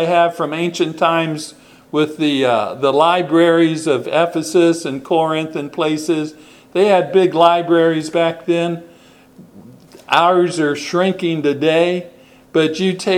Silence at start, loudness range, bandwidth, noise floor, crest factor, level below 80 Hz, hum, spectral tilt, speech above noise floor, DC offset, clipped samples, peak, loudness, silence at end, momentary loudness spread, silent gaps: 0 s; 3 LU; 13 kHz; -45 dBFS; 16 dB; -64 dBFS; none; -5.5 dB/octave; 29 dB; under 0.1%; under 0.1%; 0 dBFS; -16 LUFS; 0 s; 8 LU; none